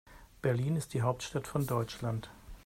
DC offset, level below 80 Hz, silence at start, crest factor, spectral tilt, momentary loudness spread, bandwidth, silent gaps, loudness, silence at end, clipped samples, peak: under 0.1%; -56 dBFS; 0.05 s; 20 dB; -6.5 dB/octave; 6 LU; 16 kHz; none; -34 LUFS; 0.05 s; under 0.1%; -16 dBFS